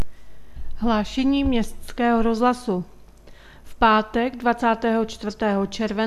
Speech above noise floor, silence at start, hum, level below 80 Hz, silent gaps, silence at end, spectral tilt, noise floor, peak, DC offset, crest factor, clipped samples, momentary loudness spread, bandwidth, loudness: 24 dB; 0 s; none; -40 dBFS; none; 0 s; -5.5 dB/octave; -45 dBFS; -4 dBFS; under 0.1%; 18 dB; under 0.1%; 10 LU; 13 kHz; -22 LUFS